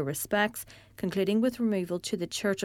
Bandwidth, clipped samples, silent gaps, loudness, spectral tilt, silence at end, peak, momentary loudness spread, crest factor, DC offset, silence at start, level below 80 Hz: 17.5 kHz; under 0.1%; none; -29 LUFS; -4.5 dB/octave; 0 s; -10 dBFS; 9 LU; 18 dB; under 0.1%; 0 s; -64 dBFS